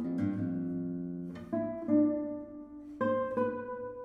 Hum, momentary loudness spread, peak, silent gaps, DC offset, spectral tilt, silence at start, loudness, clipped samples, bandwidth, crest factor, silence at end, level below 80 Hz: none; 14 LU; -16 dBFS; none; under 0.1%; -10 dB/octave; 0 s; -34 LUFS; under 0.1%; 3.9 kHz; 18 dB; 0 s; -66 dBFS